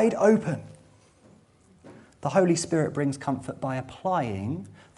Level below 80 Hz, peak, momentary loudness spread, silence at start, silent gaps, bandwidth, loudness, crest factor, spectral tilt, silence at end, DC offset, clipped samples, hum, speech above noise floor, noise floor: -64 dBFS; -8 dBFS; 12 LU; 0 s; none; 11.5 kHz; -27 LUFS; 20 dB; -6 dB/octave; 0.25 s; under 0.1%; under 0.1%; none; 33 dB; -58 dBFS